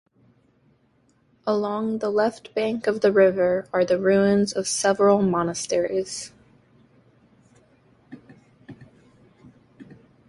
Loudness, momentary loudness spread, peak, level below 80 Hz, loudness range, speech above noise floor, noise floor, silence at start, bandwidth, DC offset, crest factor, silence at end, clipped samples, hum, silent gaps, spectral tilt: -22 LUFS; 9 LU; -6 dBFS; -62 dBFS; 11 LU; 42 dB; -63 dBFS; 1.45 s; 11.5 kHz; under 0.1%; 18 dB; 0.45 s; under 0.1%; none; none; -5 dB/octave